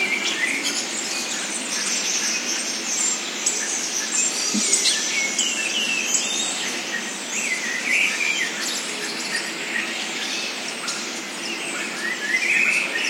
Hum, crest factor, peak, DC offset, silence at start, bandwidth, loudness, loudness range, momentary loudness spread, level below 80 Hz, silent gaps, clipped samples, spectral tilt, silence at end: none; 20 dB; -4 dBFS; under 0.1%; 0 s; 16.5 kHz; -21 LUFS; 5 LU; 8 LU; under -90 dBFS; none; under 0.1%; 0.5 dB/octave; 0 s